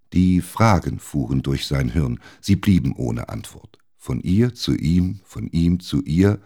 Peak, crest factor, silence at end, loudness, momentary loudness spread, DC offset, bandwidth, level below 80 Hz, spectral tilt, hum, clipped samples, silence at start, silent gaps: -2 dBFS; 18 dB; 0.05 s; -21 LUFS; 11 LU; 0.1%; 18 kHz; -36 dBFS; -7 dB/octave; none; under 0.1%; 0.1 s; none